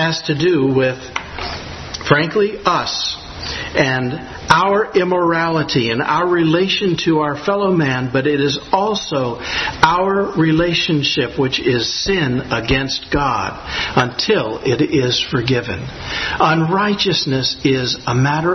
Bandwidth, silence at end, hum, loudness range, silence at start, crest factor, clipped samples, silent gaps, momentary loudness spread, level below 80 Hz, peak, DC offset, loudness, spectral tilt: 8.8 kHz; 0 s; none; 2 LU; 0 s; 16 dB; under 0.1%; none; 7 LU; -40 dBFS; 0 dBFS; under 0.1%; -16 LUFS; -5 dB/octave